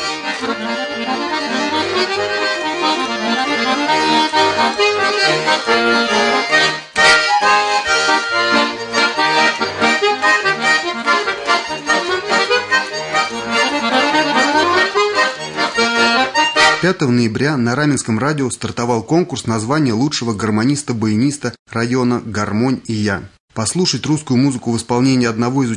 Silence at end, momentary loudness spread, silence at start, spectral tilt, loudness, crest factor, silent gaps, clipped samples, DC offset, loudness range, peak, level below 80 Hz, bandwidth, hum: 0 s; 7 LU; 0 s; -4 dB/octave; -15 LUFS; 16 dB; 21.59-21.66 s, 23.40-23.48 s; under 0.1%; under 0.1%; 5 LU; 0 dBFS; -54 dBFS; 11 kHz; none